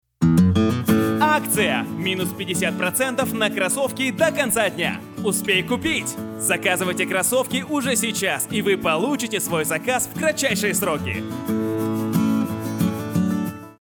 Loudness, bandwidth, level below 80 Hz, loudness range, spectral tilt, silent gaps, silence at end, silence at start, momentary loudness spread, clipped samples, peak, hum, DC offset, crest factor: -21 LUFS; over 20 kHz; -56 dBFS; 2 LU; -4 dB/octave; none; 0.1 s; 0.2 s; 6 LU; under 0.1%; -4 dBFS; none; under 0.1%; 16 dB